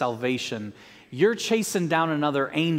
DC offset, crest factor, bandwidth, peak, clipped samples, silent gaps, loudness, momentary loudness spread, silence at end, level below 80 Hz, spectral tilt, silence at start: under 0.1%; 18 dB; 16 kHz; -6 dBFS; under 0.1%; none; -25 LUFS; 12 LU; 0 s; -68 dBFS; -4.5 dB/octave; 0 s